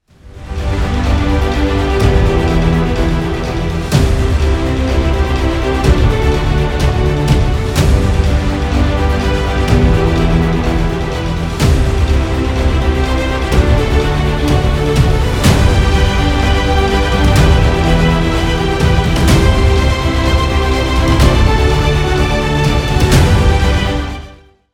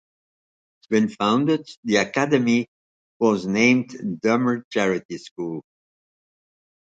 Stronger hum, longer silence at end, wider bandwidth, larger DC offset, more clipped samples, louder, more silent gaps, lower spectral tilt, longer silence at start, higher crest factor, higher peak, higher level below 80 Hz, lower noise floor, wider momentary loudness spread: neither; second, 0.4 s vs 1.25 s; first, 15.5 kHz vs 7.8 kHz; neither; neither; first, -13 LUFS vs -22 LUFS; second, none vs 1.77-1.83 s, 2.68-3.20 s, 4.64-4.71 s, 5.05-5.09 s, 5.31-5.36 s; about the same, -6 dB/octave vs -5.5 dB/octave; second, 0.25 s vs 0.9 s; second, 12 dB vs 18 dB; first, 0 dBFS vs -4 dBFS; first, -14 dBFS vs -66 dBFS; second, -37 dBFS vs under -90 dBFS; second, 5 LU vs 13 LU